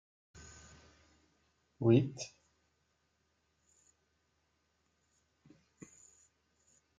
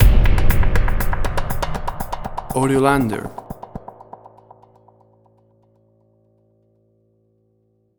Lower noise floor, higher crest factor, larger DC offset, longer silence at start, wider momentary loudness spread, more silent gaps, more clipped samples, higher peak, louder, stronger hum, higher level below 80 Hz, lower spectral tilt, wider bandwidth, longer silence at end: first, -79 dBFS vs -63 dBFS; first, 26 dB vs 18 dB; neither; first, 1.8 s vs 0 s; first, 29 LU vs 21 LU; neither; neither; second, -16 dBFS vs 0 dBFS; second, -32 LUFS vs -21 LUFS; neither; second, -74 dBFS vs -22 dBFS; about the same, -7 dB/octave vs -6.5 dB/octave; second, 7.8 kHz vs over 20 kHz; first, 4.7 s vs 4.2 s